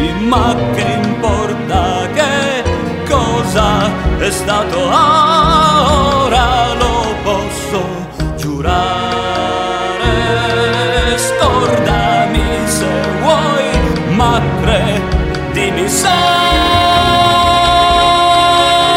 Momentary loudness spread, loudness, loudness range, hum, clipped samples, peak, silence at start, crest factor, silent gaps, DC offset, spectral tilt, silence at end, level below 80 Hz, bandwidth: 7 LU; -12 LUFS; 4 LU; none; under 0.1%; 0 dBFS; 0 s; 12 dB; none; under 0.1%; -4.5 dB/octave; 0 s; -24 dBFS; 16.5 kHz